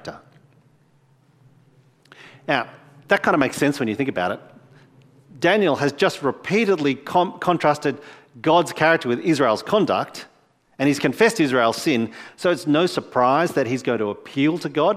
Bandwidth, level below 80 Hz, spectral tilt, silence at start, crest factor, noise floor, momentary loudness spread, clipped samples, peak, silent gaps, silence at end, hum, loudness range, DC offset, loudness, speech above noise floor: 15.5 kHz; -64 dBFS; -5 dB/octave; 0.05 s; 22 dB; -58 dBFS; 8 LU; under 0.1%; 0 dBFS; none; 0 s; none; 4 LU; under 0.1%; -20 LUFS; 38 dB